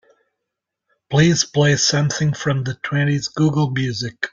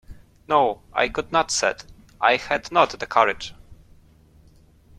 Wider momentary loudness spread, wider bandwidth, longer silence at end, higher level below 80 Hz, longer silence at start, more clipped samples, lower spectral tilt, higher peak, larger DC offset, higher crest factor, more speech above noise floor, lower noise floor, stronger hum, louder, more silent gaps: first, 8 LU vs 5 LU; second, 7.6 kHz vs 13.5 kHz; second, 0.05 s vs 1.25 s; about the same, -52 dBFS vs -50 dBFS; first, 1.1 s vs 0.1 s; neither; first, -4.5 dB/octave vs -2.5 dB/octave; about the same, -2 dBFS vs -2 dBFS; neither; second, 16 dB vs 22 dB; first, 63 dB vs 32 dB; first, -81 dBFS vs -53 dBFS; neither; first, -18 LUFS vs -22 LUFS; neither